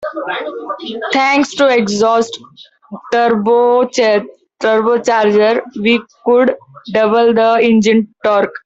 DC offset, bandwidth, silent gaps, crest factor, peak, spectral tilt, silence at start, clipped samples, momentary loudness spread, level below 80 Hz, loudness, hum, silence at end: under 0.1%; 8 kHz; none; 12 dB; -2 dBFS; -4.5 dB/octave; 0 s; under 0.1%; 11 LU; -58 dBFS; -13 LUFS; none; 0.05 s